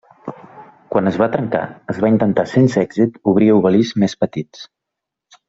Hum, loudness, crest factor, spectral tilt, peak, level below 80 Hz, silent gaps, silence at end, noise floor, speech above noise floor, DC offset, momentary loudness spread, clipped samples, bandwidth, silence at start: none; -16 LUFS; 16 dB; -7.5 dB/octave; -2 dBFS; -54 dBFS; none; 0.85 s; -81 dBFS; 66 dB; under 0.1%; 15 LU; under 0.1%; 7.8 kHz; 0.25 s